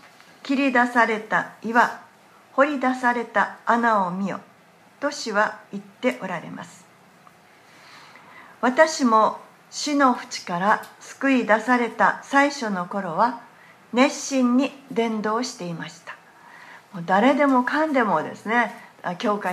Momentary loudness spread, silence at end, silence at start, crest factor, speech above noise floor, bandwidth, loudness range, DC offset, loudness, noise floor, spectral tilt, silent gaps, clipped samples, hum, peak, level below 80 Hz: 16 LU; 0 s; 0.45 s; 20 dB; 31 dB; 13.5 kHz; 7 LU; under 0.1%; -22 LUFS; -53 dBFS; -4.5 dB/octave; none; under 0.1%; none; -2 dBFS; -78 dBFS